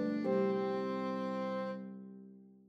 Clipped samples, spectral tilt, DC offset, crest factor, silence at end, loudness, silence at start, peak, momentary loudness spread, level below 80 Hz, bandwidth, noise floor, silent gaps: under 0.1%; -8 dB/octave; under 0.1%; 14 dB; 0.15 s; -36 LUFS; 0 s; -22 dBFS; 19 LU; -88 dBFS; 7.6 kHz; -56 dBFS; none